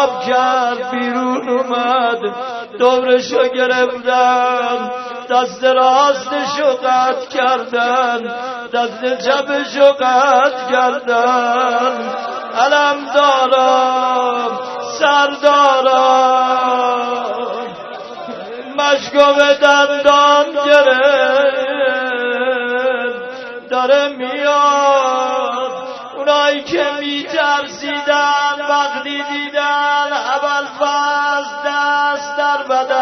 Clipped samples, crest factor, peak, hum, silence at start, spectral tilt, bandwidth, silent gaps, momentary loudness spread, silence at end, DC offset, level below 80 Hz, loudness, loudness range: under 0.1%; 14 dB; 0 dBFS; none; 0 s; -2 dB/octave; 6.4 kHz; none; 10 LU; 0 s; under 0.1%; -64 dBFS; -14 LUFS; 4 LU